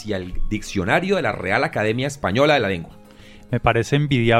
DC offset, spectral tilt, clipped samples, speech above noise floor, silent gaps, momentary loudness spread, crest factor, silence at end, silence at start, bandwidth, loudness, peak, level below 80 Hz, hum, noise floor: under 0.1%; -6 dB/octave; under 0.1%; 24 dB; none; 11 LU; 18 dB; 0 s; 0 s; 14 kHz; -21 LUFS; -2 dBFS; -34 dBFS; none; -44 dBFS